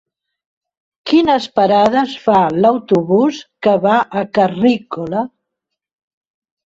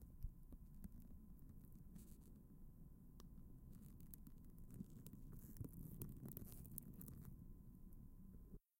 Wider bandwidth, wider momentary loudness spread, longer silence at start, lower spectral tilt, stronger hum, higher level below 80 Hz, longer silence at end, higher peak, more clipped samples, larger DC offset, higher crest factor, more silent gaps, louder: second, 7.8 kHz vs 16.5 kHz; about the same, 9 LU vs 9 LU; first, 1.05 s vs 0 s; about the same, -6.5 dB/octave vs -7 dB/octave; neither; about the same, -56 dBFS vs -60 dBFS; first, 1.4 s vs 0.2 s; first, -2 dBFS vs -26 dBFS; neither; neither; second, 14 dB vs 32 dB; neither; first, -14 LUFS vs -60 LUFS